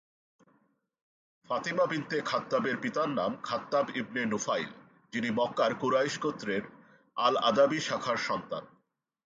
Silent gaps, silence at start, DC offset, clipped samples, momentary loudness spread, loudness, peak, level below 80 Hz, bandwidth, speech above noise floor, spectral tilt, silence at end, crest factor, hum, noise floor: none; 1.5 s; under 0.1%; under 0.1%; 9 LU; -30 LUFS; -12 dBFS; -74 dBFS; 9.2 kHz; 43 dB; -4 dB/octave; 0.6 s; 20 dB; none; -73 dBFS